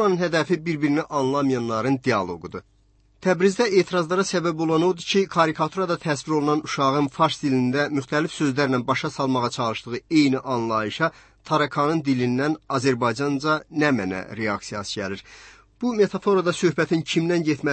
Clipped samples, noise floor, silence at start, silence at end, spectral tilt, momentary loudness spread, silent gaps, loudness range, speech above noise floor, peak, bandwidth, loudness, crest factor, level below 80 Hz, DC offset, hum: under 0.1%; -59 dBFS; 0 s; 0 s; -5.5 dB/octave; 7 LU; none; 3 LU; 37 dB; -6 dBFS; 8.8 kHz; -23 LUFS; 16 dB; -60 dBFS; under 0.1%; none